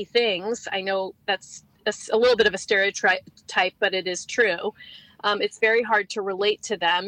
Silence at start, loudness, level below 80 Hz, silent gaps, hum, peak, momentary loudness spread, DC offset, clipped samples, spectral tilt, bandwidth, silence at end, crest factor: 0 s; -23 LUFS; -64 dBFS; none; none; -4 dBFS; 9 LU; under 0.1%; under 0.1%; -2 dB/octave; 10.5 kHz; 0 s; 20 dB